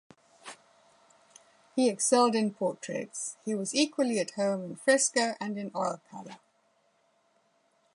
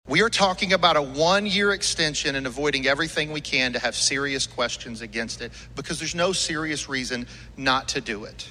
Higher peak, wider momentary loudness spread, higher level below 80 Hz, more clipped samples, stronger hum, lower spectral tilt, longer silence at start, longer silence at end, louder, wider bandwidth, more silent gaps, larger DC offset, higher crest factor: second, -10 dBFS vs -4 dBFS; first, 22 LU vs 12 LU; second, -84 dBFS vs -48 dBFS; neither; neither; about the same, -3 dB/octave vs -2.5 dB/octave; first, 0.45 s vs 0.05 s; first, 1.6 s vs 0 s; second, -29 LUFS vs -23 LUFS; second, 11.5 kHz vs 14.5 kHz; neither; neither; about the same, 20 dB vs 20 dB